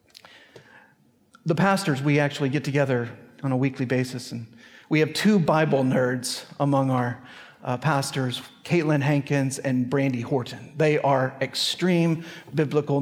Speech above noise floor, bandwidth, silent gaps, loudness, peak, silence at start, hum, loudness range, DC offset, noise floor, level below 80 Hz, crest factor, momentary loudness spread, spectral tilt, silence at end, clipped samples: 36 dB; 16 kHz; none; -24 LUFS; -6 dBFS; 0.15 s; none; 2 LU; under 0.1%; -60 dBFS; -68 dBFS; 18 dB; 11 LU; -6 dB/octave; 0 s; under 0.1%